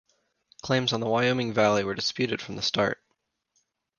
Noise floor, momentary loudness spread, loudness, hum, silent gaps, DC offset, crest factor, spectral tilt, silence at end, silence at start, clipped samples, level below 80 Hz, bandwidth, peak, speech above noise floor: -77 dBFS; 6 LU; -26 LUFS; none; none; under 0.1%; 20 dB; -4.5 dB/octave; 1.05 s; 0.65 s; under 0.1%; -62 dBFS; 10 kHz; -8 dBFS; 51 dB